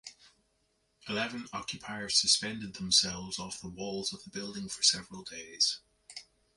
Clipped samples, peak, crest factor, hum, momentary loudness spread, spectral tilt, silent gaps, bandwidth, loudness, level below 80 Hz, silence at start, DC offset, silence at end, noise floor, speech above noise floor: under 0.1%; -10 dBFS; 24 dB; none; 20 LU; -1 dB/octave; none; 11.5 kHz; -30 LUFS; -64 dBFS; 0.05 s; under 0.1%; 0.35 s; -75 dBFS; 42 dB